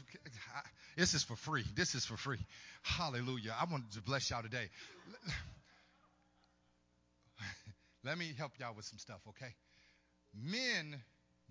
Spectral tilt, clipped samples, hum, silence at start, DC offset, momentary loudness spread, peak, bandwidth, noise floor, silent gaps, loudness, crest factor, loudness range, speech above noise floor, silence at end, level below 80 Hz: -3.5 dB/octave; under 0.1%; 60 Hz at -65 dBFS; 0 s; under 0.1%; 17 LU; -20 dBFS; 7.6 kHz; -76 dBFS; none; -41 LUFS; 24 dB; 11 LU; 34 dB; 0.45 s; -62 dBFS